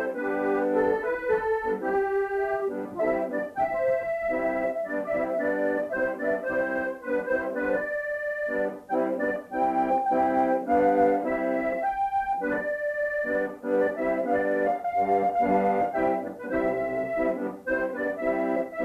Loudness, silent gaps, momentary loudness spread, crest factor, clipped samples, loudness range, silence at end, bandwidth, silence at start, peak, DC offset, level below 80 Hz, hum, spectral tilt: -27 LUFS; none; 5 LU; 14 dB; under 0.1%; 3 LU; 0 s; 13.5 kHz; 0 s; -12 dBFS; under 0.1%; -58 dBFS; none; -7.5 dB/octave